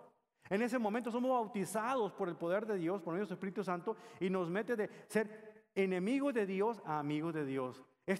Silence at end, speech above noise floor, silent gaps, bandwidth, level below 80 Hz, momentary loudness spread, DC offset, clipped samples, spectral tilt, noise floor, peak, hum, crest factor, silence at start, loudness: 0 s; 26 dB; none; 15 kHz; -82 dBFS; 6 LU; under 0.1%; under 0.1%; -6.5 dB/octave; -63 dBFS; -20 dBFS; none; 18 dB; 0 s; -38 LUFS